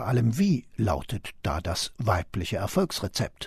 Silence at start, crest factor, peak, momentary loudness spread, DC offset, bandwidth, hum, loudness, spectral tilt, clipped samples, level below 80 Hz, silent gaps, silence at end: 0 s; 18 dB; -10 dBFS; 7 LU; under 0.1%; 13.5 kHz; none; -28 LUFS; -5.5 dB/octave; under 0.1%; -46 dBFS; none; 0 s